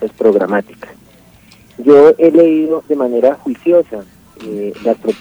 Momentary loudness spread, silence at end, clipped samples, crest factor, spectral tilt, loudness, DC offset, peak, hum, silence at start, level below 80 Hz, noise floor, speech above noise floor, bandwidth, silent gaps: 17 LU; 0.05 s; 0.4%; 12 dB; -7.5 dB/octave; -12 LUFS; under 0.1%; 0 dBFS; none; 0 s; -56 dBFS; -44 dBFS; 32 dB; over 20 kHz; none